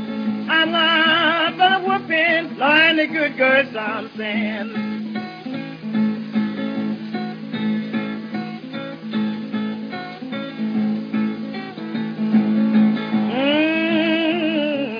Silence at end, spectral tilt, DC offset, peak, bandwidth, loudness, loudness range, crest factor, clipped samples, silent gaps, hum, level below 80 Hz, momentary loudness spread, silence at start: 0 s; -7 dB/octave; under 0.1%; -2 dBFS; 5.2 kHz; -20 LUFS; 10 LU; 18 dB; under 0.1%; none; none; -72 dBFS; 14 LU; 0 s